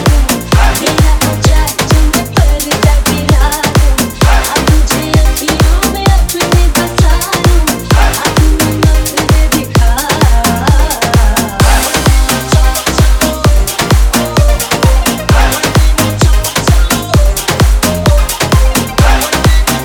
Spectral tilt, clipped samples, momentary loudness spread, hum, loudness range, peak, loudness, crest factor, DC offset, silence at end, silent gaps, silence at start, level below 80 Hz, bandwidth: -4.5 dB/octave; under 0.1%; 2 LU; none; 0 LU; 0 dBFS; -10 LUFS; 8 dB; under 0.1%; 0 s; none; 0 s; -10 dBFS; 20 kHz